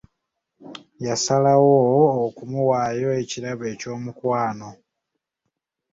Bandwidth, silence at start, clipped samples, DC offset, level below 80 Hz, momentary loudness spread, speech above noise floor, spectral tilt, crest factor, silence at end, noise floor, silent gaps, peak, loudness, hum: 8 kHz; 0.6 s; under 0.1%; under 0.1%; -62 dBFS; 20 LU; 60 dB; -5.5 dB/octave; 18 dB; 1.2 s; -80 dBFS; none; -4 dBFS; -21 LUFS; none